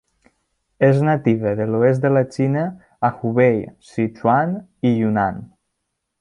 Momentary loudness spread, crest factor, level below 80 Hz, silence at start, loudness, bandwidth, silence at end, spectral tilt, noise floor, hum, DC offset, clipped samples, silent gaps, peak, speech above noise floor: 8 LU; 16 dB; -56 dBFS; 0.8 s; -19 LUFS; 10.5 kHz; 0.75 s; -9 dB/octave; -76 dBFS; none; under 0.1%; under 0.1%; none; -2 dBFS; 58 dB